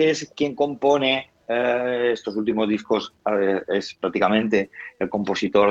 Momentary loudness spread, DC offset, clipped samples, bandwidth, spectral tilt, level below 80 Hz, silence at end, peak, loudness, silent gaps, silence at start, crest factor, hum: 7 LU; under 0.1%; under 0.1%; 8 kHz; -5 dB/octave; -60 dBFS; 0 s; -4 dBFS; -22 LUFS; none; 0 s; 18 dB; none